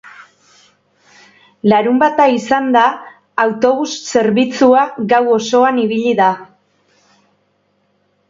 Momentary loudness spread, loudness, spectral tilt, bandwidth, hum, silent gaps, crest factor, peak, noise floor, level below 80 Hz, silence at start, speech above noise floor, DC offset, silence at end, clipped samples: 6 LU; -13 LUFS; -5 dB/octave; 7.6 kHz; none; none; 16 dB; 0 dBFS; -61 dBFS; -60 dBFS; 0.05 s; 49 dB; under 0.1%; 1.85 s; under 0.1%